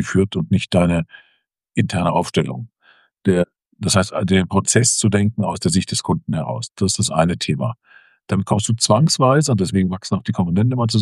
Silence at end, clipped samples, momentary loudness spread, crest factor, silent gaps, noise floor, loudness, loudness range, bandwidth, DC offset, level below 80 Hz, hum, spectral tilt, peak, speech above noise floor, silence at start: 0 s; under 0.1%; 9 LU; 18 dB; none; -64 dBFS; -18 LUFS; 3 LU; 12.5 kHz; under 0.1%; -48 dBFS; none; -5 dB/octave; 0 dBFS; 46 dB; 0 s